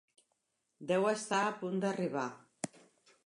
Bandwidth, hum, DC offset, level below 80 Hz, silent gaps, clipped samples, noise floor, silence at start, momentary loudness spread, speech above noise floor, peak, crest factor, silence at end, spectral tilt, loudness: 11 kHz; none; under 0.1%; -86 dBFS; none; under 0.1%; -82 dBFS; 0.8 s; 13 LU; 48 dB; -16 dBFS; 20 dB; 0.5 s; -5 dB/octave; -35 LUFS